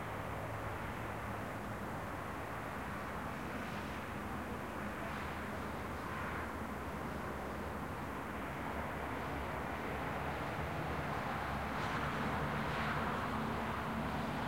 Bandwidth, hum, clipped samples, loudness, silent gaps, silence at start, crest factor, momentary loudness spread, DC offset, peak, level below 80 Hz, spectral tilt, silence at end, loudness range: 16 kHz; none; under 0.1%; -41 LUFS; none; 0 s; 16 dB; 5 LU; 0.1%; -26 dBFS; -52 dBFS; -6 dB/octave; 0 s; 4 LU